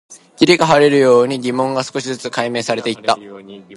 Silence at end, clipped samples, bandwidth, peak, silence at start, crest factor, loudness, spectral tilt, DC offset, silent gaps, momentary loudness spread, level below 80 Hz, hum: 0 s; under 0.1%; 11.5 kHz; 0 dBFS; 0.1 s; 16 dB; -15 LUFS; -4.5 dB/octave; under 0.1%; none; 12 LU; -60 dBFS; none